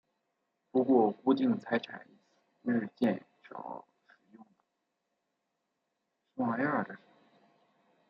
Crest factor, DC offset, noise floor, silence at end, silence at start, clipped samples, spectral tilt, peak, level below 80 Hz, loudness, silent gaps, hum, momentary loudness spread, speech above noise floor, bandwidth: 22 dB; under 0.1%; -83 dBFS; 1.15 s; 0.75 s; under 0.1%; -8.5 dB/octave; -12 dBFS; -82 dBFS; -31 LUFS; none; none; 21 LU; 53 dB; 6 kHz